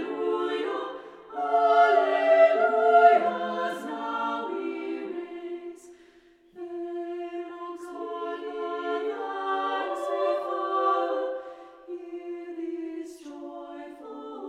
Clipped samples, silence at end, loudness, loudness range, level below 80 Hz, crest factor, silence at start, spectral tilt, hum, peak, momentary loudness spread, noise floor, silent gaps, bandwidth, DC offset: under 0.1%; 0 s; -26 LUFS; 15 LU; -76 dBFS; 22 dB; 0 s; -4.5 dB/octave; none; -6 dBFS; 21 LU; -57 dBFS; none; 10 kHz; under 0.1%